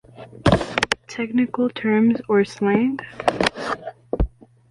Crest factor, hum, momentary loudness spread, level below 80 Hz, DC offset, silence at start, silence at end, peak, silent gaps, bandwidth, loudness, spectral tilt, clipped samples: 20 dB; none; 9 LU; -36 dBFS; under 0.1%; 0.2 s; 0.4 s; -2 dBFS; none; 11.5 kHz; -21 LUFS; -6 dB/octave; under 0.1%